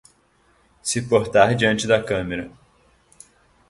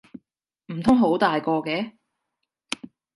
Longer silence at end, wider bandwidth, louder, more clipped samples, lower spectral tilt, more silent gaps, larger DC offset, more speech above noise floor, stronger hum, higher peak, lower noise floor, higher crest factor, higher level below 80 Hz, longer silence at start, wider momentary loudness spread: about the same, 1.2 s vs 1.25 s; about the same, 12 kHz vs 11.5 kHz; first, -20 LUFS vs -23 LUFS; neither; second, -4.5 dB/octave vs -6 dB/octave; neither; neither; second, 41 dB vs 60 dB; neither; first, 0 dBFS vs -4 dBFS; second, -60 dBFS vs -81 dBFS; about the same, 22 dB vs 22 dB; first, -50 dBFS vs -56 dBFS; first, 0.85 s vs 0.7 s; about the same, 14 LU vs 16 LU